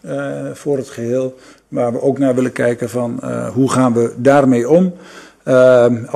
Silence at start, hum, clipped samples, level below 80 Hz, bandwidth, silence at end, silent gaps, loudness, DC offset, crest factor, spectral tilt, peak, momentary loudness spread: 0.05 s; none; under 0.1%; -58 dBFS; 13 kHz; 0 s; none; -15 LUFS; under 0.1%; 14 dB; -7 dB/octave; 0 dBFS; 13 LU